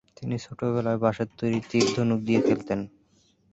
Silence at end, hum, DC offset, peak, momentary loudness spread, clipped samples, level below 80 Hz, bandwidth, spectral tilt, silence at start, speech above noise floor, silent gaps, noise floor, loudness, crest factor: 0.65 s; none; under 0.1%; -8 dBFS; 10 LU; under 0.1%; -58 dBFS; 8.2 kHz; -6 dB/octave; 0.2 s; 38 dB; none; -64 dBFS; -26 LUFS; 18 dB